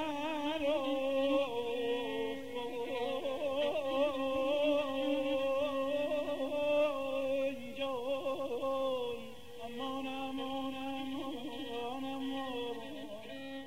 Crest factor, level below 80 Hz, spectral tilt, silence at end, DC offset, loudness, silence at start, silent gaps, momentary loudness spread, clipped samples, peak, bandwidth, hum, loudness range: 16 dB; -66 dBFS; -4.5 dB/octave; 0 s; 0.3%; -36 LUFS; 0 s; none; 9 LU; under 0.1%; -20 dBFS; 16 kHz; none; 6 LU